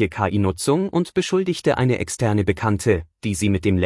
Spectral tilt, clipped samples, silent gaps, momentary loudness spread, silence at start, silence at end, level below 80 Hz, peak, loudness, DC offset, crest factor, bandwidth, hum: -6 dB/octave; under 0.1%; none; 2 LU; 0 s; 0 s; -46 dBFS; -6 dBFS; -21 LUFS; under 0.1%; 14 dB; 12 kHz; none